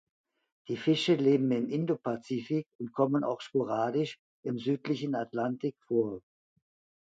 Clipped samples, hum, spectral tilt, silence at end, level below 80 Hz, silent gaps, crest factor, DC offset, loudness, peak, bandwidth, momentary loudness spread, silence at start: under 0.1%; none; -7 dB/octave; 0.85 s; -76 dBFS; 2.75-2.79 s, 4.19-4.43 s; 18 dB; under 0.1%; -31 LUFS; -14 dBFS; 9 kHz; 11 LU; 0.7 s